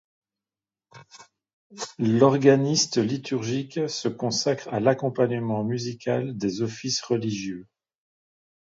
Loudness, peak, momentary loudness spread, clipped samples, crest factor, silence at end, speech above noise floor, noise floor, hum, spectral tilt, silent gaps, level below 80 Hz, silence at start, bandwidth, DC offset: -24 LUFS; -4 dBFS; 10 LU; under 0.1%; 22 dB; 1.1 s; over 66 dB; under -90 dBFS; none; -5 dB/octave; 1.53-1.70 s; -66 dBFS; 0.95 s; 7.8 kHz; under 0.1%